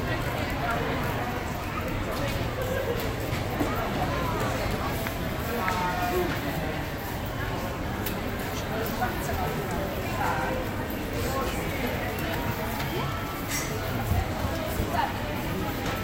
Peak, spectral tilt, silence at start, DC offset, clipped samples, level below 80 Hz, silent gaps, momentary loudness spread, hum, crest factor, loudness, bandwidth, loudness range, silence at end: -10 dBFS; -5 dB/octave; 0 s; under 0.1%; under 0.1%; -38 dBFS; none; 4 LU; none; 18 dB; -29 LUFS; 16 kHz; 2 LU; 0 s